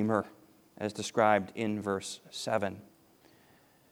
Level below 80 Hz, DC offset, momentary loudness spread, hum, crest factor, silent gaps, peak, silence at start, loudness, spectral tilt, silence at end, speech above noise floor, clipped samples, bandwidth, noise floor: -76 dBFS; under 0.1%; 13 LU; none; 22 dB; none; -10 dBFS; 0 s; -32 LUFS; -5 dB/octave; 1.1 s; 32 dB; under 0.1%; over 20 kHz; -63 dBFS